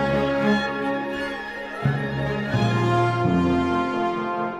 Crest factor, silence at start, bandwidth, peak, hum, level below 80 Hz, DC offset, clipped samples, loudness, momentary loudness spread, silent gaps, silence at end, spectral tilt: 16 dB; 0 s; 11.5 kHz; -8 dBFS; none; -46 dBFS; under 0.1%; under 0.1%; -23 LUFS; 7 LU; none; 0 s; -7 dB/octave